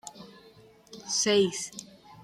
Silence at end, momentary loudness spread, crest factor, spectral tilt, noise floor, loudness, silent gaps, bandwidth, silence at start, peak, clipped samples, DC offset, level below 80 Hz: 0 s; 24 LU; 20 dB; -2.5 dB/octave; -55 dBFS; -27 LUFS; none; 14 kHz; 0.05 s; -12 dBFS; under 0.1%; under 0.1%; -72 dBFS